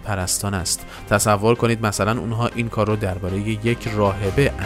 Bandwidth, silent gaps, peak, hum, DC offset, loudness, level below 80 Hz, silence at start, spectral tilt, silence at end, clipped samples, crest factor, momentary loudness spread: 16 kHz; none; -4 dBFS; none; under 0.1%; -21 LUFS; -38 dBFS; 0 s; -5 dB/octave; 0 s; under 0.1%; 16 dB; 6 LU